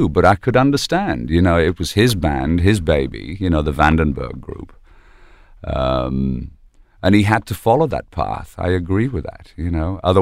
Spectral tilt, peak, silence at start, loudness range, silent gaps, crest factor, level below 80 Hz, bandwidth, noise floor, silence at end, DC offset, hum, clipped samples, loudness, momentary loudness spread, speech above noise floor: -6.5 dB/octave; 0 dBFS; 0 s; 4 LU; none; 16 dB; -30 dBFS; 15.5 kHz; -45 dBFS; 0 s; under 0.1%; none; under 0.1%; -18 LUFS; 13 LU; 28 dB